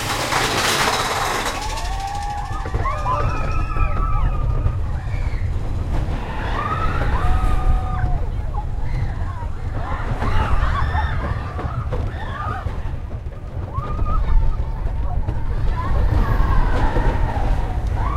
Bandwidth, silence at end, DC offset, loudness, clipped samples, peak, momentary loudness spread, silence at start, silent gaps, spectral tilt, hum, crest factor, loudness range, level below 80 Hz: 15.5 kHz; 0 s; under 0.1%; -23 LUFS; under 0.1%; -4 dBFS; 7 LU; 0 s; none; -5 dB/octave; none; 16 dB; 4 LU; -22 dBFS